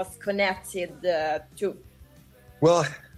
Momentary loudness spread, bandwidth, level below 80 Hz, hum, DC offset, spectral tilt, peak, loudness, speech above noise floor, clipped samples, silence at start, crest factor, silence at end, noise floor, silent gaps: 11 LU; 15 kHz; -58 dBFS; none; under 0.1%; -5 dB/octave; -8 dBFS; -26 LUFS; 27 dB; under 0.1%; 0 s; 20 dB; 0 s; -53 dBFS; none